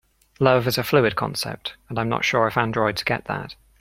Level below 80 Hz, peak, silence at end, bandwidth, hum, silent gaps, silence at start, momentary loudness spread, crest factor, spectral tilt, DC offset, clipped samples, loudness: -52 dBFS; 0 dBFS; 0.3 s; 16.5 kHz; none; none; 0.4 s; 11 LU; 22 dB; -5 dB/octave; under 0.1%; under 0.1%; -22 LUFS